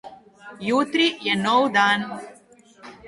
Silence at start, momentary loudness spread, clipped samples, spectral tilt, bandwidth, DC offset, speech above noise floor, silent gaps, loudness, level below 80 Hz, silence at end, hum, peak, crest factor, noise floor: 0.05 s; 14 LU; under 0.1%; -4 dB/octave; 11.5 kHz; under 0.1%; 31 dB; none; -20 LUFS; -66 dBFS; 0 s; none; -6 dBFS; 18 dB; -52 dBFS